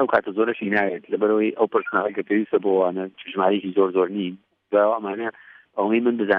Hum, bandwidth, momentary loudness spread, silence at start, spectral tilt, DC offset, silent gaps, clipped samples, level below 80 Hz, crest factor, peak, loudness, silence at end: none; 4.8 kHz; 9 LU; 0 s; -9 dB/octave; under 0.1%; none; under 0.1%; -70 dBFS; 18 dB; -4 dBFS; -22 LUFS; 0 s